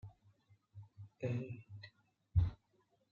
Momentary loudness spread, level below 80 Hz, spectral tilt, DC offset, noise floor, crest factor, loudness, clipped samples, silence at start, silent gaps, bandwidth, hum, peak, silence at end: 23 LU; -52 dBFS; -8.5 dB/octave; under 0.1%; -77 dBFS; 22 dB; -41 LUFS; under 0.1%; 0.05 s; none; 6.8 kHz; none; -20 dBFS; 0.55 s